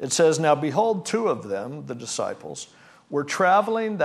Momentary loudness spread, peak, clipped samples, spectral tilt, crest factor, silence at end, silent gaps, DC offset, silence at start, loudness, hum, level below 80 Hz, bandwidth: 16 LU; -6 dBFS; under 0.1%; -4 dB/octave; 16 dB; 0 s; none; under 0.1%; 0 s; -23 LUFS; none; -74 dBFS; 13.5 kHz